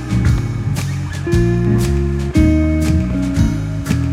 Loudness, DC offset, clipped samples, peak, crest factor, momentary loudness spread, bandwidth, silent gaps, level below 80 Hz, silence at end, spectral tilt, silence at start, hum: -16 LUFS; under 0.1%; under 0.1%; 0 dBFS; 14 dB; 6 LU; 15 kHz; none; -22 dBFS; 0 s; -7 dB/octave; 0 s; none